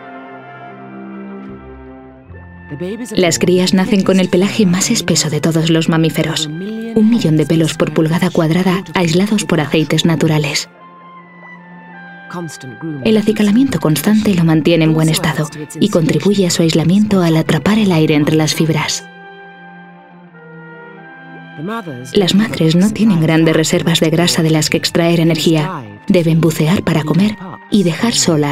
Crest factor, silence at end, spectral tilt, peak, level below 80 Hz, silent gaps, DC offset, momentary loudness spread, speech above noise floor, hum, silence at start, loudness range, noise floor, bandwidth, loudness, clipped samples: 14 dB; 0 s; -5 dB/octave; 0 dBFS; -48 dBFS; none; under 0.1%; 19 LU; 26 dB; none; 0 s; 7 LU; -39 dBFS; 15.5 kHz; -13 LUFS; under 0.1%